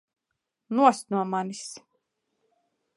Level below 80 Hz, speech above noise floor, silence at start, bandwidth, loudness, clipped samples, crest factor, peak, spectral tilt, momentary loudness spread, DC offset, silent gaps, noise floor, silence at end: -86 dBFS; 58 dB; 0.7 s; 11.5 kHz; -25 LUFS; under 0.1%; 24 dB; -6 dBFS; -5 dB/octave; 18 LU; under 0.1%; none; -83 dBFS; 1.2 s